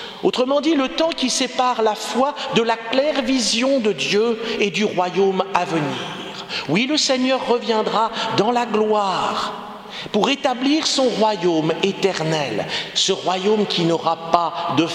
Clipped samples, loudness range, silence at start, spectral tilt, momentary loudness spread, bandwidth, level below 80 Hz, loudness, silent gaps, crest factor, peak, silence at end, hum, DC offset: under 0.1%; 1 LU; 0 s; -3.5 dB/octave; 5 LU; 14 kHz; -58 dBFS; -19 LUFS; none; 20 dB; 0 dBFS; 0 s; none; under 0.1%